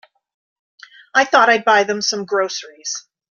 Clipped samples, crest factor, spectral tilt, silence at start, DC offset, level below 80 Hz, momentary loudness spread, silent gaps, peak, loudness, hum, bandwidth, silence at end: under 0.1%; 18 dB; -1.5 dB/octave; 1.15 s; under 0.1%; -70 dBFS; 14 LU; none; 0 dBFS; -16 LUFS; none; 7.6 kHz; 0.3 s